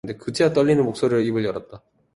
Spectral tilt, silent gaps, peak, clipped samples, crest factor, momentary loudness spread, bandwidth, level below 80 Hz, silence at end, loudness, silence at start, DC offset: -6.5 dB/octave; none; -6 dBFS; under 0.1%; 14 dB; 11 LU; 11.5 kHz; -56 dBFS; 0.35 s; -21 LUFS; 0.05 s; under 0.1%